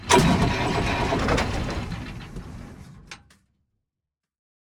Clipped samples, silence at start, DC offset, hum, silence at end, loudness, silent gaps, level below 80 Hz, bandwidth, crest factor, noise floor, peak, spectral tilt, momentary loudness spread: under 0.1%; 0 s; under 0.1%; none; 1.65 s; -23 LUFS; none; -36 dBFS; over 20 kHz; 24 dB; -86 dBFS; -2 dBFS; -4.5 dB/octave; 24 LU